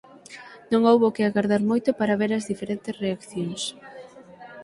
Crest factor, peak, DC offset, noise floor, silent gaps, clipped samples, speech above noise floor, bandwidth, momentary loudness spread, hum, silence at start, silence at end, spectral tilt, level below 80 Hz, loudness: 20 dB; -4 dBFS; under 0.1%; -45 dBFS; none; under 0.1%; 22 dB; 11.5 kHz; 24 LU; none; 0.3 s; 0 s; -5.5 dB/octave; -64 dBFS; -24 LUFS